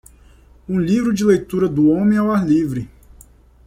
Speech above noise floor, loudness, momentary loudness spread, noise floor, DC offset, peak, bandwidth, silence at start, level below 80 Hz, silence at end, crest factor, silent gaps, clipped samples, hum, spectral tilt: 31 dB; -17 LUFS; 9 LU; -47 dBFS; under 0.1%; -4 dBFS; 14.5 kHz; 0.7 s; -46 dBFS; 0.8 s; 14 dB; none; under 0.1%; none; -7.5 dB/octave